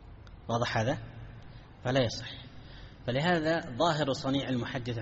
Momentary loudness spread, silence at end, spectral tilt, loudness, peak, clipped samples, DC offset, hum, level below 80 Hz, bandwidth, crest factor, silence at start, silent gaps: 21 LU; 0 s; -4.5 dB/octave; -31 LUFS; -14 dBFS; under 0.1%; under 0.1%; none; -54 dBFS; 7.6 kHz; 18 dB; 0 s; none